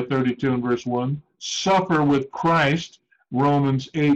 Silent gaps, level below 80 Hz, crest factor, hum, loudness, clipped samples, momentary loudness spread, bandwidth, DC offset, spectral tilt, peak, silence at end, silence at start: none; -56 dBFS; 10 dB; none; -22 LUFS; under 0.1%; 9 LU; 8.2 kHz; under 0.1%; -6 dB/octave; -12 dBFS; 0 s; 0 s